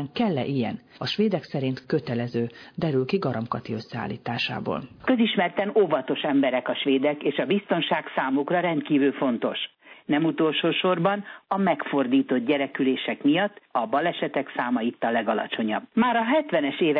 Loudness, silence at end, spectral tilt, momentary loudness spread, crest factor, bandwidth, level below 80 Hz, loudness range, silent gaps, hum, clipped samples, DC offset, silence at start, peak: -25 LUFS; 0 s; -7.5 dB/octave; 8 LU; 14 dB; 5.4 kHz; -66 dBFS; 3 LU; none; none; under 0.1%; under 0.1%; 0 s; -10 dBFS